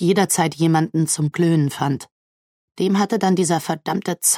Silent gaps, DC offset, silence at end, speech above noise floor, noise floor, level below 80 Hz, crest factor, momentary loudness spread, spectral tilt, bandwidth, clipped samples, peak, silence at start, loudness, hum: 2.11-2.68 s; under 0.1%; 0 s; over 71 dB; under -90 dBFS; -66 dBFS; 16 dB; 6 LU; -5 dB/octave; 16.5 kHz; under 0.1%; -4 dBFS; 0 s; -19 LUFS; none